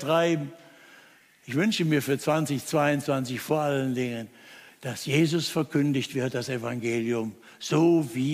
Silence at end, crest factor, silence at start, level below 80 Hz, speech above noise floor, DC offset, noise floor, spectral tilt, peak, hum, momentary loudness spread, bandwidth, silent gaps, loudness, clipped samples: 0 s; 16 dB; 0 s; -70 dBFS; 30 dB; under 0.1%; -56 dBFS; -5.5 dB/octave; -10 dBFS; none; 11 LU; 15.5 kHz; none; -26 LUFS; under 0.1%